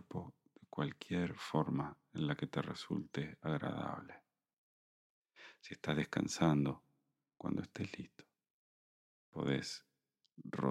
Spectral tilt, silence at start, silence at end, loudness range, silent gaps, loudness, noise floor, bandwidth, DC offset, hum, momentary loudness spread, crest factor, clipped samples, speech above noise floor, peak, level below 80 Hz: -6 dB/octave; 0.1 s; 0 s; 5 LU; 4.53-5.25 s, 8.50-9.32 s; -40 LUFS; -83 dBFS; 13 kHz; under 0.1%; none; 17 LU; 24 dB; under 0.1%; 44 dB; -18 dBFS; -70 dBFS